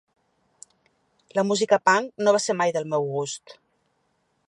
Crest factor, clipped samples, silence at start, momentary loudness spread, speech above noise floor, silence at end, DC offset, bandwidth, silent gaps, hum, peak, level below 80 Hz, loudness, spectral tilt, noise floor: 20 dB; under 0.1%; 1.35 s; 10 LU; 48 dB; 0.95 s; under 0.1%; 11.5 kHz; none; none; -4 dBFS; -78 dBFS; -23 LUFS; -3.5 dB/octave; -71 dBFS